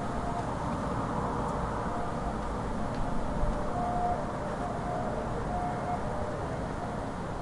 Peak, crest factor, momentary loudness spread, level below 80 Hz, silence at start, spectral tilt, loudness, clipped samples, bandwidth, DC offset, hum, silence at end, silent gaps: -16 dBFS; 14 dB; 3 LU; -40 dBFS; 0 s; -7 dB/octave; -33 LUFS; under 0.1%; 11.5 kHz; under 0.1%; none; 0 s; none